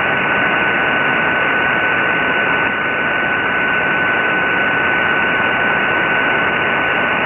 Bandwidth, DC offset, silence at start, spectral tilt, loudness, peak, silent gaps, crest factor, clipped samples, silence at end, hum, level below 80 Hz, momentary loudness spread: 6.4 kHz; under 0.1%; 0 s; -6.5 dB/octave; -14 LUFS; -2 dBFS; none; 14 dB; under 0.1%; 0 s; none; -46 dBFS; 1 LU